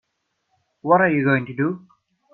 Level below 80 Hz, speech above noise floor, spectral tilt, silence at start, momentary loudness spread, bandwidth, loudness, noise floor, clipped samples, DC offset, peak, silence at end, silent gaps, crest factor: -64 dBFS; 55 dB; -10.5 dB/octave; 0.85 s; 15 LU; 4.2 kHz; -19 LUFS; -74 dBFS; under 0.1%; under 0.1%; -2 dBFS; 0.55 s; none; 20 dB